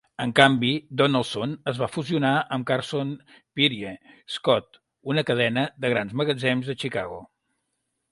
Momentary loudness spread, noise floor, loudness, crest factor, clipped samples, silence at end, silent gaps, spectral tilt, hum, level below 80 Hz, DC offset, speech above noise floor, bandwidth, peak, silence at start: 15 LU; -77 dBFS; -24 LUFS; 24 dB; under 0.1%; 0.85 s; none; -5.5 dB/octave; none; -62 dBFS; under 0.1%; 53 dB; 11.5 kHz; 0 dBFS; 0.2 s